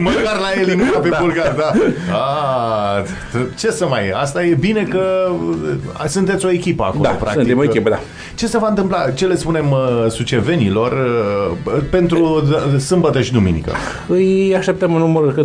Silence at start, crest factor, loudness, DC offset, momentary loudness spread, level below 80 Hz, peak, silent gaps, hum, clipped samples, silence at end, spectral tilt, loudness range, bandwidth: 0 s; 14 dB; -16 LUFS; under 0.1%; 6 LU; -38 dBFS; 0 dBFS; none; none; under 0.1%; 0 s; -6 dB/octave; 2 LU; 11 kHz